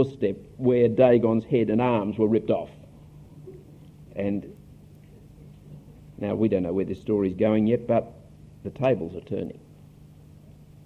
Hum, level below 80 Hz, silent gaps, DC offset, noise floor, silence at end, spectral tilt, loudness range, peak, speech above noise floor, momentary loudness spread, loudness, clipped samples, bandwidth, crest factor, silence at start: 50 Hz at -50 dBFS; -54 dBFS; none; under 0.1%; -49 dBFS; 0.35 s; -9.5 dB/octave; 12 LU; -6 dBFS; 26 dB; 21 LU; -24 LUFS; under 0.1%; 6.2 kHz; 20 dB; 0 s